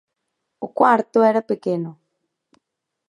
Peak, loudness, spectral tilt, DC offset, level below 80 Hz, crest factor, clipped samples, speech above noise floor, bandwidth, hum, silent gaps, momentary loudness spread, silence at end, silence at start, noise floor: -2 dBFS; -19 LUFS; -7.5 dB/octave; under 0.1%; -76 dBFS; 20 dB; under 0.1%; 59 dB; 10.5 kHz; none; none; 17 LU; 1.15 s; 0.6 s; -77 dBFS